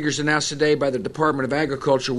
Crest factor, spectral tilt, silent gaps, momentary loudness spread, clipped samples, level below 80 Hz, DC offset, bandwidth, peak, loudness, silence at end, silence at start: 16 dB; -4.5 dB/octave; none; 3 LU; under 0.1%; -54 dBFS; under 0.1%; 11.5 kHz; -4 dBFS; -21 LUFS; 0 s; 0 s